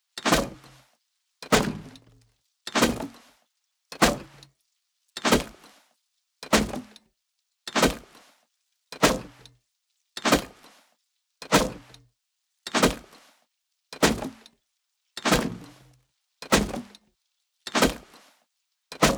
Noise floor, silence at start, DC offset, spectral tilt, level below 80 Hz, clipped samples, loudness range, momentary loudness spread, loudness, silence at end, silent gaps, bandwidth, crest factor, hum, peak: -79 dBFS; 0.15 s; under 0.1%; -3.5 dB/octave; -44 dBFS; under 0.1%; 2 LU; 20 LU; -25 LUFS; 0 s; none; over 20 kHz; 26 dB; none; -2 dBFS